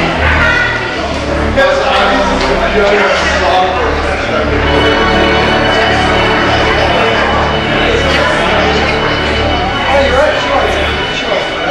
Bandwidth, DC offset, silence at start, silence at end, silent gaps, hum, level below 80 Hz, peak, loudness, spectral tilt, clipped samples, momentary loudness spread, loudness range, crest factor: 12 kHz; under 0.1%; 0 s; 0 s; none; none; -22 dBFS; 0 dBFS; -10 LUFS; -4.5 dB/octave; under 0.1%; 4 LU; 1 LU; 10 dB